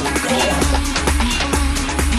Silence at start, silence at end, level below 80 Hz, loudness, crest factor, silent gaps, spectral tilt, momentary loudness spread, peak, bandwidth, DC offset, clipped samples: 0 s; 0 s; -22 dBFS; -17 LUFS; 14 dB; none; -3.5 dB/octave; 2 LU; -4 dBFS; 15.5 kHz; under 0.1%; under 0.1%